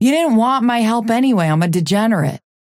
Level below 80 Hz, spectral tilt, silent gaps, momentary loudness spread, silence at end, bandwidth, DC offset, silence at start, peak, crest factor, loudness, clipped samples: -62 dBFS; -6 dB/octave; none; 3 LU; 0.3 s; 15.5 kHz; under 0.1%; 0 s; -4 dBFS; 10 dB; -15 LUFS; under 0.1%